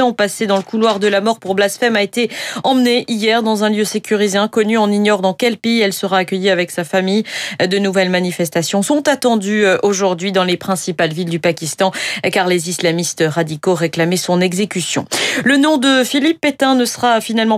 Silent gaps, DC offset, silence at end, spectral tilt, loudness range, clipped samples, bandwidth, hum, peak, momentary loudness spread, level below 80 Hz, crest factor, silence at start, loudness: none; under 0.1%; 0 s; -4 dB/octave; 2 LU; under 0.1%; 16 kHz; none; -2 dBFS; 5 LU; -62 dBFS; 12 dB; 0 s; -15 LUFS